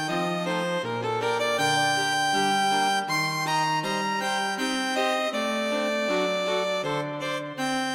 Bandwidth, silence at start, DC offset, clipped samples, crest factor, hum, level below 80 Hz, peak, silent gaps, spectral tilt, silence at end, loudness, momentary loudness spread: 17.5 kHz; 0 s; under 0.1%; under 0.1%; 14 dB; none; -66 dBFS; -12 dBFS; none; -3 dB/octave; 0 s; -25 LUFS; 6 LU